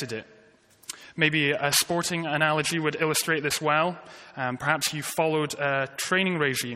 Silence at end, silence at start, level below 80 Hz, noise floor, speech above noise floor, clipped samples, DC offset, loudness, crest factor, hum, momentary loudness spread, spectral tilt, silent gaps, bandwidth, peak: 0 s; 0 s; -66 dBFS; -57 dBFS; 31 dB; under 0.1%; under 0.1%; -25 LUFS; 22 dB; none; 15 LU; -3 dB/octave; none; 16 kHz; -6 dBFS